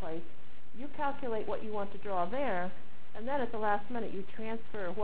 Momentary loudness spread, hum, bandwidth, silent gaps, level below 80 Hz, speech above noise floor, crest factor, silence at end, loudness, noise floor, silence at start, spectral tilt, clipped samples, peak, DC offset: 14 LU; none; 4 kHz; none; -60 dBFS; 21 dB; 20 dB; 0 s; -37 LUFS; -57 dBFS; 0 s; -9 dB/octave; under 0.1%; -18 dBFS; 4%